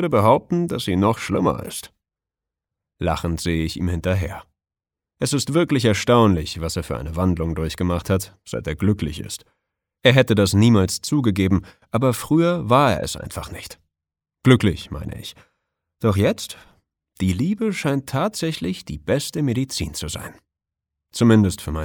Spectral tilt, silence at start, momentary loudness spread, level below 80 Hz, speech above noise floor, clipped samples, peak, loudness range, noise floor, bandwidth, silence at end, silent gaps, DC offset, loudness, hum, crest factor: -6 dB/octave; 0 s; 16 LU; -40 dBFS; 69 dB; under 0.1%; -2 dBFS; 6 LU; -89 dBFS; 19.5 kHz; 0 s; none; under 0.1%; -20 LUFS; none; 20 dB